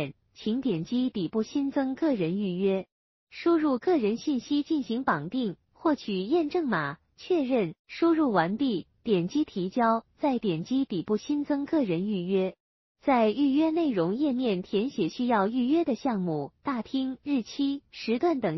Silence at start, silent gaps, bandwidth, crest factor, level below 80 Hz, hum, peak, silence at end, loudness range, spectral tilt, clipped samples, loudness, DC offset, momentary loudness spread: 0 s; 2.92-3.27 s, 7.79-7.85 s, 12.60-12.95 s; 6.2 kHz; 18 dB; -66 dBFS; none; -10 dBFS; 0 s; 2 LU; -5.5 dB/octave; under 0.1%; -28 LUFS; under 0.1%; 7 LU